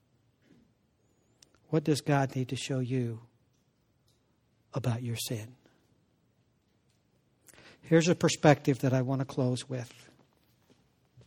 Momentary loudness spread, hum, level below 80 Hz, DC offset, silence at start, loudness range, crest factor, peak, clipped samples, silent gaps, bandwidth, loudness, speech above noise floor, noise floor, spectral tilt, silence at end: 15 LU; none; -68 dBFS; under 0.1%; 1.7 s; 11 LU; 26 dB; -6 dBFS; under 0.1%; none; 16.5 kHz; -30 LUFS; 43 dB; -71 dBFS; -6 dB/octave; 1.4 s